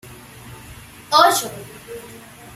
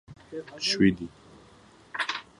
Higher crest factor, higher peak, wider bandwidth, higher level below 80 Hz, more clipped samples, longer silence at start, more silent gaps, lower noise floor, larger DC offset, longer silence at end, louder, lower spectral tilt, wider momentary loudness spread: about the same, 22 dB vs 22 dB; first, 0 dBFS vs -8 dBFS; first, 16 kHz vs 11.5 kHz; about the same, -54 dBFS vs -56 dBFS; neither; about the same, 0.1 s vs 0.1 s; neither; second, -40 dBFS vs -55 dBFS; neither; first, 0.4 s vs 0.15 s; first, -16 LUFS vs -27 LUFS; second, -2 dB/octave vs -4.5 dB/octave; first, 26 LU vs 18 LU